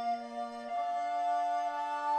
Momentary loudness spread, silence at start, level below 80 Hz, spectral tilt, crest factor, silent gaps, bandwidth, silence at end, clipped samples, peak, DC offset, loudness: 7 LU; 0 s; -78 dBFS; -2.5 dB/octave; 10 dB; none; 9.4 kHz; 0 s; under 0.1%; -22 dBFS; under 0.1%; -34 LUFS